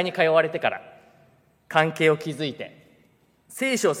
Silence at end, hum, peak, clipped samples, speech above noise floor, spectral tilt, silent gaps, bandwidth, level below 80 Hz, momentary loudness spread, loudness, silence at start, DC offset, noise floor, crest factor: 0 s; none; -2 dBFS; under 0.1%; 38 dB; -4.5 dB/octave; none; 16 kHz; -76 dBFS; 18 LU; -23 LUFS; 0 s; under 0.1%; -61 dBFS; 22 dB